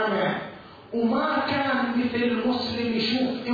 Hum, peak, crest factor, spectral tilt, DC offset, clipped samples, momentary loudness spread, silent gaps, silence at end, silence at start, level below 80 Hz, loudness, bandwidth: none; -12 dBFS; 12 dB; -6.5 dB/octave; under 0.1%; under 0.1%; 8 LU; none; 0 s; 0 s; -60 dBFS; -25 LUFS; 5 kHz